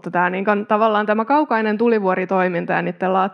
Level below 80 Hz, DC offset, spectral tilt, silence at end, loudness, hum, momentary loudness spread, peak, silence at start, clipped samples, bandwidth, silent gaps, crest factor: -78 dBFS; under 0.1%; -8.5 dB/octave; 0 s; -18 LUFS; none; 3 LU; -2 dBFS; 0.05 s; under 0.1%; 6.2 kHz; none; 16 dB